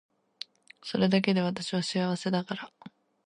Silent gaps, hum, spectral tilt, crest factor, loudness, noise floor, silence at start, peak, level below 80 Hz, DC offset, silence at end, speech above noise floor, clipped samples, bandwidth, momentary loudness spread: none; none; -5.5 dB/octave; 20 dB; -29 LUFS; -48 dBFS; 0.85 s; -10 dBFS; -72 dBFS; under 0.1%; 0.4 s; 20 dB; under 0.1%; 10.5 kHz; 19 LU